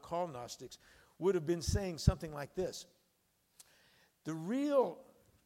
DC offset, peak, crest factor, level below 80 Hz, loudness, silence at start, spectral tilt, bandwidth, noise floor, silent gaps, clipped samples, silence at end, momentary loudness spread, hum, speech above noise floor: under 0.1%; -14 dBFS; 24 dB; -50 dBFS; -37 LUFS; 0.05 s; -6 dB/octave; 16 kHz; -77 dBFS; none; under 0.1%; 0.45 s; 17 LU; none; 41 dB